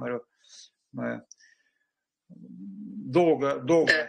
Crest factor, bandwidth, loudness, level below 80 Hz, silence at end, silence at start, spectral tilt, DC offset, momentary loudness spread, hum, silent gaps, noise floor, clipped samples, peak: 22 dB; 9.4 kHz; -26 LUFS; -74 dBFS; 0 s; 0 s; -5.5 dB/octave; under 0.1%; 21 LU; none; none; -81 dBFS; under 0.1%; -6 dBFS